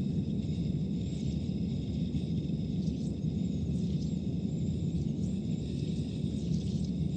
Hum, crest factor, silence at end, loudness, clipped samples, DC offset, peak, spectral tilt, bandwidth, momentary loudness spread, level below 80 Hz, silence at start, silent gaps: none; 12 dB; 0 s; -34 LUFS; under 0.1%; under 0.1%; -20 dBFS; -8.5 dB/octave; 8.8 kHz; 2 LU; -44 dBFS; 0 s; none